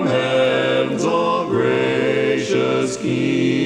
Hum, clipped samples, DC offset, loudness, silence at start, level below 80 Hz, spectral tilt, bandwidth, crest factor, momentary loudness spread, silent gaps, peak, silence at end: none; under 0.1%; under 0.1%; -18 LUFS; 0 s; -58 dBFS; -5.5 dB/octave; 11 kHz; 12 dB; 3 LU; none; -6 dBFS; 0 s